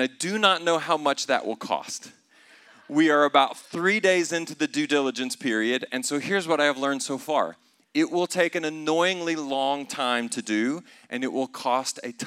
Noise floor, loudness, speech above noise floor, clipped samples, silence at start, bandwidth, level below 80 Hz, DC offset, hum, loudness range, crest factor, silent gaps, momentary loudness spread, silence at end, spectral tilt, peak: -55 dBFS; -25 LUFS; 30 dB; under 0.1%; 0 s; 15 kHz; -86 dBFS; under 0.1%; none; 3 LU; 22 dB; none; 9 LU; 0 s; -3 dB/octave; -4 dBFS